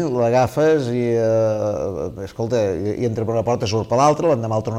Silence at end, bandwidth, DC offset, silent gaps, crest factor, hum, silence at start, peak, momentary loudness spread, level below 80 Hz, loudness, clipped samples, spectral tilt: 0 s; 15.5 kHz; under 0.1%; none; 16 dB; none; 0 s; -4 dBFS; 7 LU; -48 dBFS; -19 LUFS; under 0.1%; -6.5 dB/octave